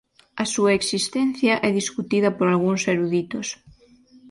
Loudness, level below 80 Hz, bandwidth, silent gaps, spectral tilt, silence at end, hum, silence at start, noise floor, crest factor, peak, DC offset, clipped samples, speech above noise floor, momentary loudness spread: -22 LUFS; -60 dBFS; 11.5 kHz; none; -4.5 dB/octave; 0 s; none; 0.35 s; -53 dBFS; 18 dB; -6 dBFS; under 0.1%; under 0.1%; 31 dB; 10 LU